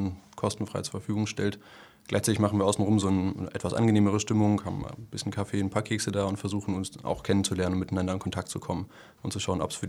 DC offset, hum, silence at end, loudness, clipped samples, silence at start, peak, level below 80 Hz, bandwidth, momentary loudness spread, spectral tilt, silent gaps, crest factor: under 0.1%; none; 0 s; -29 LUFS; under 0.1%; 0 s; -8 dBFS; -56 dBFS; 14 kHz; 11 LU; -5.5 dB/octave; none; 20 dB